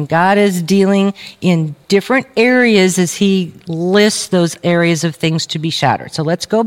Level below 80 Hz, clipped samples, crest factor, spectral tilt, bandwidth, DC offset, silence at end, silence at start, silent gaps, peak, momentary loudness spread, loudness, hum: -58 dBFS; under 0.1%; 14 dB; -5 dB/octave; 16.5 kHz; under 0.1%; 0 s; 0 s; none; 0 dBFS; 7 LU; -14 LUFS; none